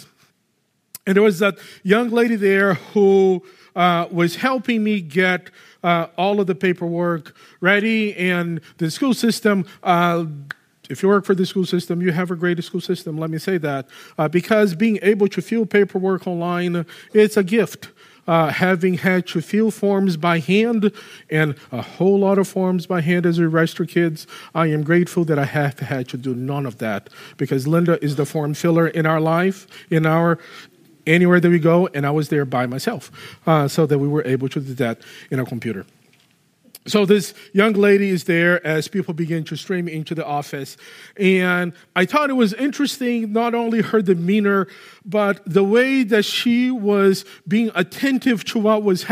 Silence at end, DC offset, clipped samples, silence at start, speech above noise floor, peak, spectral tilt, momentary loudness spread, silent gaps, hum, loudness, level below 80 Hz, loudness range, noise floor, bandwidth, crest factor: 0 s; under 0.1%; under 0.1%; 1.05 s; 49 dB; -2 dBFS; -6.5 dB/octave; 10 LU; none; none; -19 LUFS; -68 dBFS; 4 LU; -67 dBFS; 15.5 kHz; 18 dB